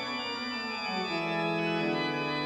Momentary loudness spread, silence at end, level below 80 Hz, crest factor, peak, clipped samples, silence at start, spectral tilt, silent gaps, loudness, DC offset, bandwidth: 4 LU; 0 s; -68 dBFS; 14 dB; -18 dBFS; under 0.1%; 0 s; -5 dB/octave; none; -31 LUFS; under 0.1%; 11.5 kHz